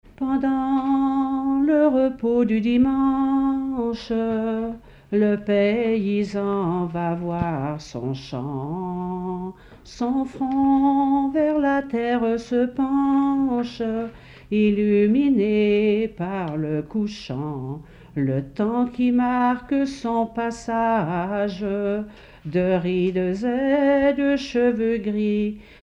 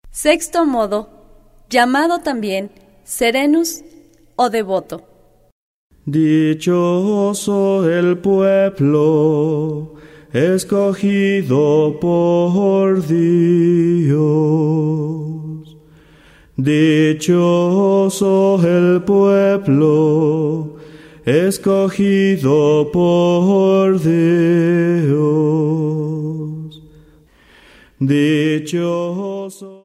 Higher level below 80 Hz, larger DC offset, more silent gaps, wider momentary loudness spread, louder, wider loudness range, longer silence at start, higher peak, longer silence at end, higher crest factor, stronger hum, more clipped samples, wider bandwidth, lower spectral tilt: about the same, -50 dBFS vs -52 dBFS; neither; second, none vs 5.52-5.90 s; about the same, 10 LU vs 11 LU; second, -22 LUFS vs -15 LUFS; about the same, 5 LU vs 6 LU; first, 0.2 s vs 0.05 s; second, -8 dBFS vs 0 dBFS; about the same, 0.2 s vs 0.1 s; about the same, 14 dB vs 14 dB; neither; neither; second, 8 kHz vs 15.5 kHz; about the same, -7.5 dB/octave vs -6.5 dB/octave